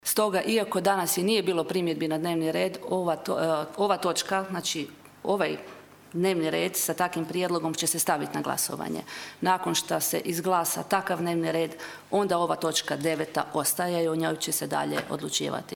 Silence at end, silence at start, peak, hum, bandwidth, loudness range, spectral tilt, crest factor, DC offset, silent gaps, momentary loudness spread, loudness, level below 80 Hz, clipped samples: 0 s; 0.05 s; -8 dBFS; none; over 20 kHz; 2 LU; -3.5 dB/octave; 20 dB; under 0.1%; none; 5 LU; -27 LUFS; -70 dBFS; under 0.1%